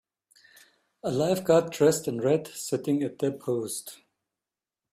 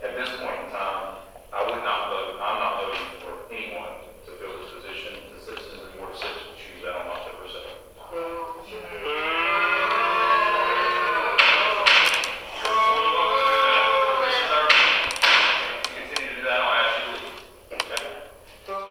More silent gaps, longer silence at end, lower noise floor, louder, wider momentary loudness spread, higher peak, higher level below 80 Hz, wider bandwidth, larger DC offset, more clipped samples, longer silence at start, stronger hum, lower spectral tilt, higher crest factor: neither; first, 0.95 s vs 0 s; first, under -90 dBFS vs -44 dBFS; second, -27 LUFS vs -21 LUFS; second, 11 LU vs 22 LU; second, -8 dBFS vs 0 dBFS; second, -68 dBFS vs -54 dBFS; about the same, 15.5 kHz vs 16.5 kHz; neither; neither; first, 1.05 s vs 0 s; neither; first, -5.5 dB/octave vs -1 dB/octave; about the same, 20 dB vs 24 dB